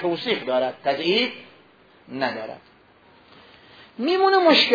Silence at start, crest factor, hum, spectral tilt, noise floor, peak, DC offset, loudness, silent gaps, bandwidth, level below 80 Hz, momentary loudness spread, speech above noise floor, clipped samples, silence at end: 0 s; 20 dB; none; -4.5 dB/octave; -54 dBFS; -4 dBFS; under 0.1%; -21 LUFS; none; 5 kHz; -70 dBFS; 22 LU; 33 dB; under 0.1%; 0 s